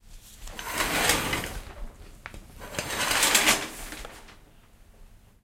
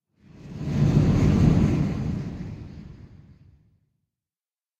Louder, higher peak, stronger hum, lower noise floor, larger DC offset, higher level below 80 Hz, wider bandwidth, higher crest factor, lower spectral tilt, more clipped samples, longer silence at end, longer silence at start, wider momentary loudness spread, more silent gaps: about the same, -24 LUFS vs -22 LUFS; about the same, -6 dBFS vs -6 dBFS; neither; second, -54 dBFS vs under -90 dBFS; neither; second, -44 dBFS vs -36 dBFS; first, 16.5 kHz vs 8 kHz; first, 24 dB vs 18 dB; second, -1 dB/octave vs -8.5 dB/octave; neither; second, 0.25 s vs 1.85 s; second, 0.05 s vs 0.45 s; about the same, 24 LU vs 22 LU; neither